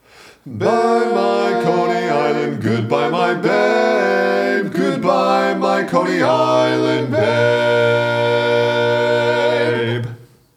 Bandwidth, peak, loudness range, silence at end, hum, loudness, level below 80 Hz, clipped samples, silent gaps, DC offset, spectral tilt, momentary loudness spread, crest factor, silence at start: 15 kHz; 0 dBFS; 1 LU; 0.35 s; none; -16 LUFS; -66 dBFS; under 0.1%; none; under 0.1%; -6 dB/octave; 4 LU; 16 dB; 0.45 s